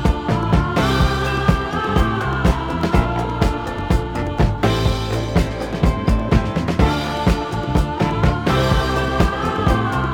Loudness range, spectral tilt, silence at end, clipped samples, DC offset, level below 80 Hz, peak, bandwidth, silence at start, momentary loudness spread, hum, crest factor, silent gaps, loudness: 1 LU; -6.5 dB/octave; 0 s; under 0.1%; under 0.1%; -24 dBFS; -2 dBFS; 17.5 kHz; 0 s; 3 LU; none; 16 dB; none; -19 LUFS